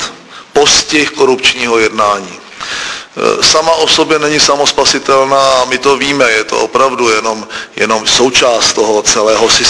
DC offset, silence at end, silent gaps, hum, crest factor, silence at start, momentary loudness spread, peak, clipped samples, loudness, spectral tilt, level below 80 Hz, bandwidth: under 0.1%; 0 s; none; none; 10 dB; 0 s; 11 LU; 0 dBFS; 0.5%; -9 LUFS; -1.5 dB/octave; -42 dBFS; 11 kHz